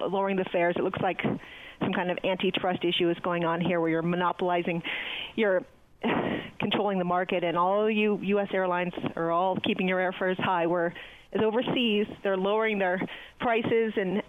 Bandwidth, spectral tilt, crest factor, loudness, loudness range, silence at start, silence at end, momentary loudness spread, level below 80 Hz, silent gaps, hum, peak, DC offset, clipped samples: 6.6 kHz; -7.5 dB/octave; 14 dB; -28 LUFS; 2 LU; 0 s; 0.05 s; 6 LU; -62 dBFS; none; none; -14 dBFS; under 0.1%; under 0.1%